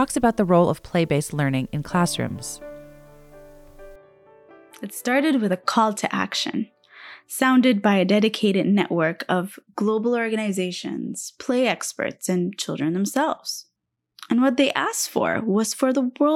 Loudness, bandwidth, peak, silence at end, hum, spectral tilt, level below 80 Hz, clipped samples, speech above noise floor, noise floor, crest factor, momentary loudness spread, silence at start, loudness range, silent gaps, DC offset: -22 LUFS; 16.5 kHz; -6 dBFS; 0 s; none; -5 dB/octave; -54 dBFS; under 0.1%; 56 dB; -78 dBFS; 16 dB; 12 LU; 0 s; 7 LU; none; under 0.1%